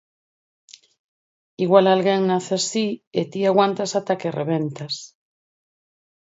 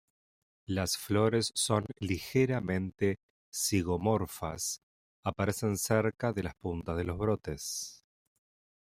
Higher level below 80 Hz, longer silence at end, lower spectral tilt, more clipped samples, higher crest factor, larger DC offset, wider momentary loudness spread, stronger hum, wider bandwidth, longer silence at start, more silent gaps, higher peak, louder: second, -72 dBFS vs -58 dBFS; first, 1.35 s vs 0.85 s; about the same, -5 dB/octave vs -4.5 dB/octave; neither; about the same, 22 dB vs 20 dB; neither; about the same, 11 LU vs 9 LU; neither; second, 8 kHz vs 16 kHz; first, 1.6 s vs 0.7 s; second, 3.07-3.11 s vs 3.23-3.52 s, 4.83-5.23 s; first, 0 dBFS vs -12 dBFS; first, -21 LUFS vs -32 LUFS